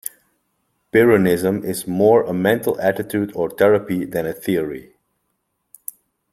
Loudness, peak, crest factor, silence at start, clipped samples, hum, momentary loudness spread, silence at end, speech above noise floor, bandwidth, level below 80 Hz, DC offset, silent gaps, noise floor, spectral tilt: -18 LUFS; 0 dBFS; 20 dB; 0.95 s; under 0.1%; none; 19 LU; 1.5 s; 55 dB; 16.5 kHz; -56 dBFS; under 0.1%; none; -72 dBFS; -6 dB/octave